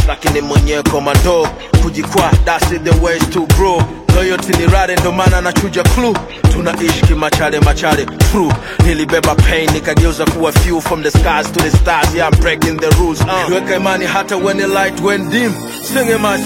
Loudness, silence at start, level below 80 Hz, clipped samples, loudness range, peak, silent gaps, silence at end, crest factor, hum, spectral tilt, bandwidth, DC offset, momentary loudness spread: -12 LUFS; 0 s; -18 dBFS; under 0.1%; 1 LU; 0 dBFS; none; 0 s; 12 dB; none; -5 dB/octave; 17 kHz; under 0.1%; 4 LU